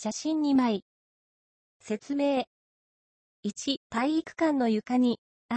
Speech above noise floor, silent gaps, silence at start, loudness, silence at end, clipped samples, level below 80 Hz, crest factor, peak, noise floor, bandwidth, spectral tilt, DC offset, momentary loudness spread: over 63 dB; 0.82-1.80 s, 2.47-3.43 s, 3.77-3.90 s, 5.18-5.49 s; 0 s; -28 LUFS; 0 s; under 0.1%; -72 dBFS; 16 dB; -14 dBFS; under -90 dBFS; 8.6 kHz; -4.5 dB/octave; under 0.1%; 11 LU